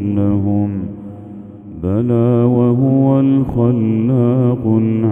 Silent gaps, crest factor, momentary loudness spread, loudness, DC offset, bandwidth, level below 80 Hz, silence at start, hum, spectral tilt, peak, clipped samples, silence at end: none; 14 dB; 19 LU; -14 LUFS; under 0.1%; 3.6 kHz; -42 dBFS; 0 s; none; -12.5 dB/octave; 0 dBFS; under 0.1%; 0 s